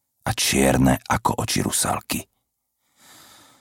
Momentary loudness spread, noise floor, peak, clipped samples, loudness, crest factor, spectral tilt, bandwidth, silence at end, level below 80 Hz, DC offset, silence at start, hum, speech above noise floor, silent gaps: 10 LU; -75 dBFS; -4 dBFS; under 0.1%; -21 LUFS; 18 dB; -4 dB/octave; 17 kHz; 1.35 s; -40 dBFS; under 0.1%; 0.25 s; none; 54 dB; none